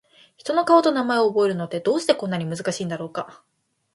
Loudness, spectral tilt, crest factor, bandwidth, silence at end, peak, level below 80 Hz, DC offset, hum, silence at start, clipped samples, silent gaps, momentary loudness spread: -22 LUFS; -5.5 dB/octave; 20 dB; 11.5 kHz; 0.6 s; -2 dBFS; -70 dBFS; under 0.1%; none; 0.45 s; under 0.1%; none; 14 LU